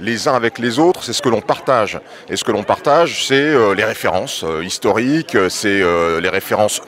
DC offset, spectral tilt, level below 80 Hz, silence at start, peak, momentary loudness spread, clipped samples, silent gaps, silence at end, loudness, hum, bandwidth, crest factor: under 0.1%; -4 dB/octave; -50 dBFS; 0 s; 0 dBFS; 7 LU; under 0.1%; none; 0 s; -16 LUFS; none; 16 kHz; 16 dB